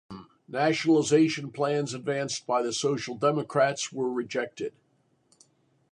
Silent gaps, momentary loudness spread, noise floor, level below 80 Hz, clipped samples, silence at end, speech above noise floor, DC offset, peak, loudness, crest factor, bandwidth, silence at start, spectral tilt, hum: none; 13 LU; -69 dBFS; -72 dBFS; under 0.1%; 1.25 s; 42 dB; under 0.1%; -10 dBFS; -27 LUFS; 18 dB; 11 kHz; 0.1 s; -4.5 dB/octave; none